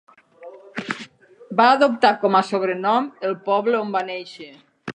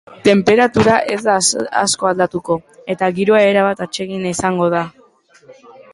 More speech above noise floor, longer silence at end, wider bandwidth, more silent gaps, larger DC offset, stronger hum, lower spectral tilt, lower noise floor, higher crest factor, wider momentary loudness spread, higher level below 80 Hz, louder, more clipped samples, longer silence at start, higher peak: second, 24 dB vs 35 dB; about the same, 0.05 s vs 0.1 s; second, 9.8 kHz vs 11.5 kHz; neither; neither; neither; about the same, -5 dB/octave vs -4 dB/octave; second, -44 dBFS vs -50 dBFS; about the same, 20 dB vs 16 dB; first, 18 LU vs 10 LU; second, -76 dBFS vs -50 dBFS; second, -20 LUFS vs -15 LUFS; neither; first, 0.4 s vs 0.1 s; about the same, -2 dBFS vs 0 dBFS